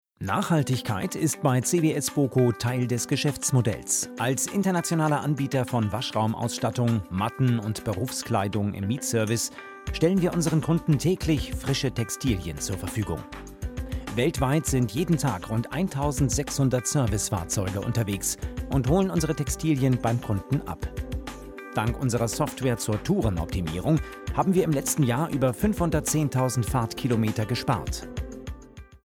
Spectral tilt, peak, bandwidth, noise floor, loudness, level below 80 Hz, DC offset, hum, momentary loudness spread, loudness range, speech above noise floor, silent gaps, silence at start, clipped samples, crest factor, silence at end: -5.5 dB/octave; -10 dBFS; 17 kHz; -46 dBFS; -26 LUFS; -40 dBFS; under 0.1%; none; 8 LU; 3 LU; 20 dB; none; 0.2 s; under 0.1%; 16 dB; 0.1 s